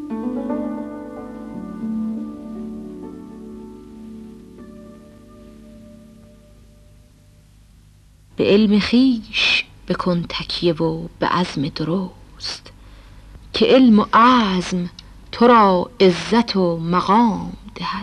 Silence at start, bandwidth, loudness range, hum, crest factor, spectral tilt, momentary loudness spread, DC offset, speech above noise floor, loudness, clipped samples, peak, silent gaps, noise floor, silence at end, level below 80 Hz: 0 s; 11 kHz; 18 LU; 50 Hz at -55 dBFS; 18 dB; -6 dB/octave; 24 LU; under 0.1%; 33 dB; -18 LUFS; under 0.1%; -2 dBFS; none; -49 dBFS; 0 s; -46 dBFS